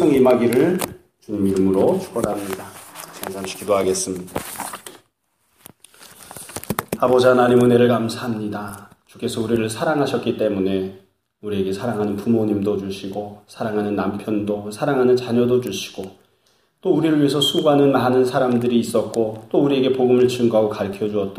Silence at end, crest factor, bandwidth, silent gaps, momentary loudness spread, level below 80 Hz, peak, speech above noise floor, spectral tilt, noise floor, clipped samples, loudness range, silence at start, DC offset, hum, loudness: 0 s; 18 dB; 15.5 kHz; none; 16 LU; -56 dBFS; -2 dBFS; 48 dB; -5.5 dB/octave; -67 dBFS; under 0.1%; 8 LU; 0 s; under 0.1%; none; -19 LUFS